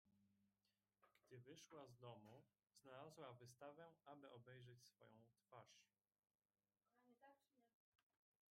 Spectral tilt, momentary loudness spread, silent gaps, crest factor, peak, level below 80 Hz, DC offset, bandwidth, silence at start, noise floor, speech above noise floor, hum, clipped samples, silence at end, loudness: -5 dB/octave; 6 LU; 7.74-7.92 s; 22 dB; -46 dBFS; under -90 dBFS; under 0.1%; 14 kHz; 0.05 s; under -90 dBFS; over 25 dB; none; under 0.1%; 0.55 s; -65 LUFS